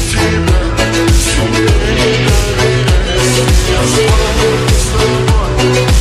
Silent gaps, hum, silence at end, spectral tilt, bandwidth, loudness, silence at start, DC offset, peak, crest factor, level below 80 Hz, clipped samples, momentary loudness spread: none; none; 0 s; -4.5 dB/octave; 15 kHz; -11 LUFS; 0 s; under 0.1%; 0 dBFS; 10 dB; -14 dBFS; under 0.1%; 2 LU